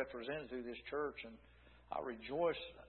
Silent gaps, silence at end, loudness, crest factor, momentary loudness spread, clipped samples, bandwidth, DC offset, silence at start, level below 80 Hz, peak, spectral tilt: none; 0 s; -43 LUFS; 18 dB; 13 LU; under 0.1%; 4.3 kHz; under 0.1%; 0 s; -66 dBFS; -26 dBFS; -3 dB/octave